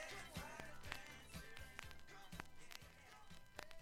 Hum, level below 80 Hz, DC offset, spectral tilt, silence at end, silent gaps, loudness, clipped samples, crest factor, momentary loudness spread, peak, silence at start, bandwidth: none; -64 dBFS; under 0.1%; -3 dB/octave; 0 s; none; -56 LUFS; under 0.1%; 30 dB; 9 LU; -26 dBFS; 0 s; 17 kHz